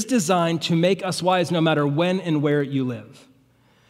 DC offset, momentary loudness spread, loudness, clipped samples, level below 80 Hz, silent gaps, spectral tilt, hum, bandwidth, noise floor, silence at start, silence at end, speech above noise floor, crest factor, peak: under 0.1%; 5 LU; -21 LUFS; under 0.1%; -70 dBFS; none; -5.5 dB/octave; none; 15.5 kHz; -58 dBFS; 0 s; 0.8 s; 37 dB; 16 dB; -6 dBFS